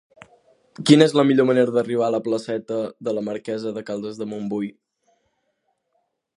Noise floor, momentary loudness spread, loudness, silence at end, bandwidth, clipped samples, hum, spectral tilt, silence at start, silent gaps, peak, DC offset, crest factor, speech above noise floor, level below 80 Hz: -72 dBFS; 14 LU; -21 LUFS; 1.65 s; 11.5 kHz; under 0.1%; none; -6 dB/octave; 0.8 s; none; 0 dBFS; under 0.1%; 22 dB; 52 dB; -70 dBFS